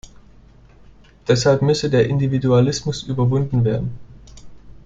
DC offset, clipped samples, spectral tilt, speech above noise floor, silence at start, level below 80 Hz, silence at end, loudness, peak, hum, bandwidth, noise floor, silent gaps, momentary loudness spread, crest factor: under 0.1%; under 0.1%; -6.5 dB/octave; 29 dB; 1.25 s; -44 dBFS; 0.1 s; -18 LUFS; -2 dBFS; none; 7.8 kHz; -47 dBFS; none; 8 LU; 18 dB